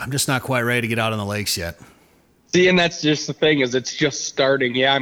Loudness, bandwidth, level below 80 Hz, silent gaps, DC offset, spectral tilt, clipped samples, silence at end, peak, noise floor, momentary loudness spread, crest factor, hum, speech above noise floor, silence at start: -19 LUFS; over 20 kHz; -52 dBFS; none; under 0.1%; -4 dB/octave; under 0.1%; 0 s; -6 dBFS; -56 dBFS; 7 LU; 14 dB; none; 37 dB; 0 s